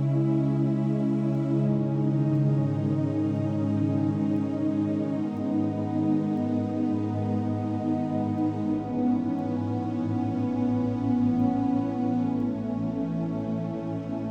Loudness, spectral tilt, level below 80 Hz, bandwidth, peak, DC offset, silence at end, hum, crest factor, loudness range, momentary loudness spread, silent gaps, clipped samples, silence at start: -27 LUFS; -10 dB/octave; -58 dBFS; 7.2 kHz; -14 dBFS; under 0.1%; 0 s; none; 12 dB; 2 LU; 5 LU; none; under 0.1%; 0 s